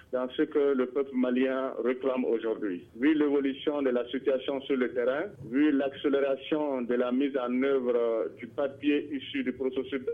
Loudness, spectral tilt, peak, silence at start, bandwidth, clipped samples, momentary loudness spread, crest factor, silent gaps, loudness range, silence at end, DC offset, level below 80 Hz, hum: -29 LUFS; -7.5 dB/octave; -14 dBFS; 0.1 s; 4.1 kHz; under 0.1%; 6 LU; 14 dB; none; 1 LU; 0 s; under 0.1%; -70 dBFS; none